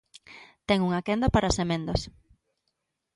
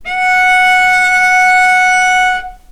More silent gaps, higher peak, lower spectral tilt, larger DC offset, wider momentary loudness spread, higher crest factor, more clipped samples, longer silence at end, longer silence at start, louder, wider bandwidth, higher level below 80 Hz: neither; second, -8 dBFS vs 0 dBFS; first, -5.5 dB/octave vs 1 dB/octave; neither; first, 20 LU vs 4 LU; first, 20 dB vs 10 dB; neither; first, 1.05 s vs 0.15 s; first, 0.3 s vs 0 s; second, -26 LUFS vs -8 LUFS; second, 11.5 kHz vs 16.5 kHz; about the same, -40 dBFS vs -40 dBFS